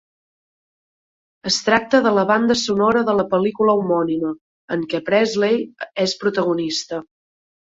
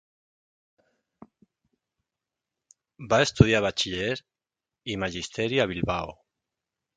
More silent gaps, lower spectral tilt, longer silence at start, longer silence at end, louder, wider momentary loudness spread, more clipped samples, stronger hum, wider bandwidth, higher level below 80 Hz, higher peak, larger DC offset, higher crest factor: first, 4.41-4.68 s vs none; about the same, -4.5 dB/octave vs -5 dB/octave; second, 1.45 s vs 3 s; second, 0.6 s vs 0.85 s; first, -19 LUFS vs -25 LUFS; second, 11 LU vs 15 LU; neither; neither; second, 8 kHz vs 9.4 kHz; second, -58 dBFS vs -48 dBFS; about the same, -2 dBFS vs 0 dBFS; neither; second, 18 dB vs 28 dB